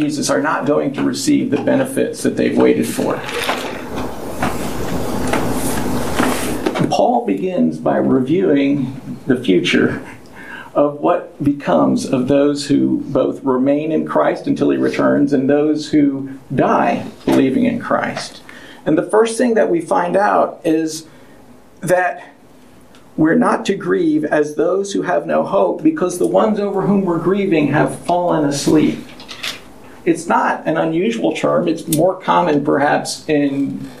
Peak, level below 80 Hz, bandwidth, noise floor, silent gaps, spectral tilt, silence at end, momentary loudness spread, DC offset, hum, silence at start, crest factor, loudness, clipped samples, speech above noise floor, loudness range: 0 dBFS; -46 dBFS; 15.5 kHz; -45 dBFS; none; -5.5 dB/octave; 0 s; 9 LU; under 0.1%; none; 0 s; 16 dB; -16 LUFS; under 0.1%; 29 dB; 3 LU